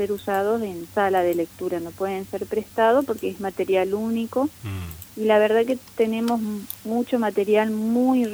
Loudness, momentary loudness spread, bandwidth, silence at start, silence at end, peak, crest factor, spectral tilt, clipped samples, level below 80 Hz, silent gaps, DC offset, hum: -23 LUFS; 9 LU; over 20 kHz; 0 s; 0 s; -6 dBFS; 16 dB; -6 dB/octave; under 0.1%; -56 dBFS; none; under 0.1%; none